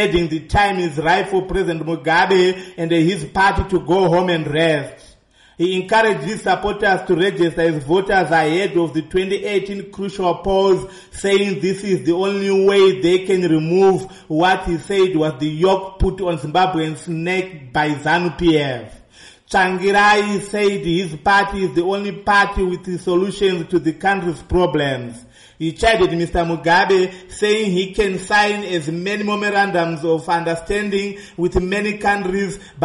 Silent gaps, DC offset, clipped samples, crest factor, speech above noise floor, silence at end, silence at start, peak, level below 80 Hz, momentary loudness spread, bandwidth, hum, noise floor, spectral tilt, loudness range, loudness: none; under 0.1%; under 0.1%; 14 dB; 33 dB; 0 s; 0 s; -4 dBFS; -36 dBFS; 8 LU; 11.5 kHz; none; -50 dBFS; -5.5 dB/octave; 3 LU; -17 LUFS